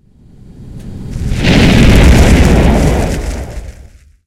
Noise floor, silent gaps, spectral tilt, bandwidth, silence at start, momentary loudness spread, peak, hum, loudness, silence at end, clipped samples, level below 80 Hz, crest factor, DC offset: -38 dBFS; none; -6 dB/octave; 15.5 kHz; 0.6 s; 21 LU; 0 dBFS; none; -9 LUFS; 0.55 s; 2%; -14 dBFS; 10 dB; under 0.1%